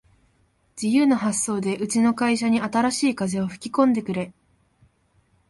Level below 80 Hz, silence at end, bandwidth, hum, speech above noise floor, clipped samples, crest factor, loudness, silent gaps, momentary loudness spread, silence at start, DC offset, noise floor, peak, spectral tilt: -60 dBFS; 1.2 s; 11.5 kHz; none; 42 dB; under 0.1%; 18 dB; -22 LUFS; none; 9 LU; 0.75 s; under 0.1%; -64 dBFS; -6 dBFS; -4.5 dB/octave